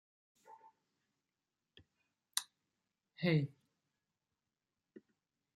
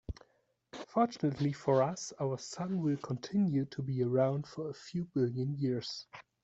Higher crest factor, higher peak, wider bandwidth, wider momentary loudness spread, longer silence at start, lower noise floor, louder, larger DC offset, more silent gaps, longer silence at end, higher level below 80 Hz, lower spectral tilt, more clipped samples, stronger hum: first, 30 dB vs 18 dB; about the same, -14 dBFS vs -16 dBFS; first, 13 kHz vs 8.2 kHz; first, 26 LU vs 12 LU; first, 0.5 s vs 0.1 s; first, under -90 dBFS vs -74 dBFS; second, -38 LUFS vs -34 LUFS; neither; neither; first, 2.1 s vs 0.2 s; second, -84 dBFS vs -62 dBFS; second, -5 dB/octave vs -7 dB/octave; neither; neither